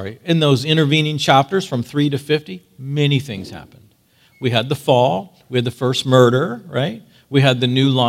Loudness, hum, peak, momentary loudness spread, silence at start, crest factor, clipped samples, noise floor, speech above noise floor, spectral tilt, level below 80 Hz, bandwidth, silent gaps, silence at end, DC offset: -17 LUFS; none; 0 dBFS; 11 LU; 0 s; 18 dB; under 0.1%; -55 dBFS; 38 dB; -6 dB/octave; -60 dBFS; 15.5 kHz; none; 0 s; under 0.1%